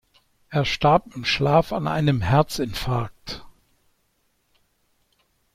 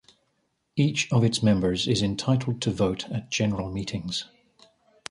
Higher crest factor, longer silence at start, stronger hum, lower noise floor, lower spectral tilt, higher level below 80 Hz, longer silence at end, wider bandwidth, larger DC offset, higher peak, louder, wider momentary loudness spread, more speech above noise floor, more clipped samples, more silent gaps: about the same, 20 dB vs 18 dB; second, 0.5 s vs 0.75 s; neither; second, -68 dBFS vs -73 dBFS; about the same, -6 dB/octave vs -5.5 dB/octave; about the same, -46 dBFS vs -50 dBFS; first, 2.05 s vs 0.85 s; first, 15.5 kHz vs 11.5 kHz; neither; about the same, -6 dBFS vs -8 dBFS; first, -22 LUFS vs -26 LUFS; first, 13 LU vs 9 LU; about the same, 47 dB vs 49 dB; neither; neither